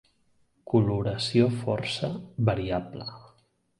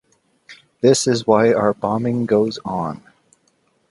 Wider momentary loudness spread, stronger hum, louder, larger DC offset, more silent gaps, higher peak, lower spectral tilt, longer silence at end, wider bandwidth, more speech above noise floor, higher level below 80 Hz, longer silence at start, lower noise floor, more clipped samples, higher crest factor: about the same, 12 LU vs 10 LU; neither; second, -27 LUFS vs -18 LUFS; neither; neither; second, -8 dBFS vs 0 dBFS; first, -6.5 dB/octave vs -5 dB/octave; second, 0.6 s vs 0.95 s; about the same, 11.5 kHz vs 11.5 kHz; second, 40 dB vs 46 dB; about the same, -52 dBFS vs -56 dBFS; first, 0.65 s vs 0.5 s; first, -67 dBFS vs -63 dBFS; neither; about the same, 20 dB vs 20 dB